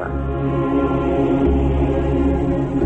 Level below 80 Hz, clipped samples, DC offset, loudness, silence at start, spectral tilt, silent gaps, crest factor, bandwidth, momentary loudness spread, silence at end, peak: -24 dBFS; under 0.1%; under 0.1%; -19 LUFS; 0 s; -10 dB/octave; none; 10 dB; 7.8 kHz; 4 LU; 0 s; -8 dBFS